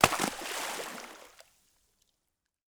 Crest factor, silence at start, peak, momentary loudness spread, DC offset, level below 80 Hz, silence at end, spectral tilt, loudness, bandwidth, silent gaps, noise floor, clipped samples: 34 dB; 0 s; -2 dBFS; 21 LU; under 0.1%; -60 dBFS; 1.4 s; -2.5 dB/octave; -33 LUFS; over 20 kHz; none; -83 dBFS; under 0.1%